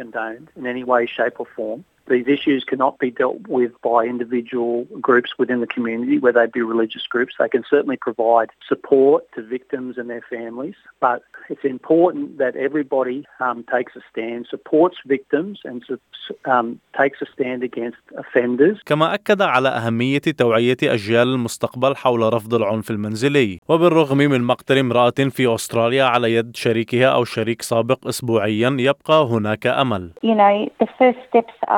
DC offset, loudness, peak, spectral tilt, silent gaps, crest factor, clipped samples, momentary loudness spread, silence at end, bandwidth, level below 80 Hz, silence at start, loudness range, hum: under 0.1%; -19 LUFS; -2 dBFS; -6 dB/octave; 23.58-23.62 s; 18 dB; under 0.1%; 12 LU; 0 s; 17.5 kHz; -68 dBFS; 0 s; 5 LU; none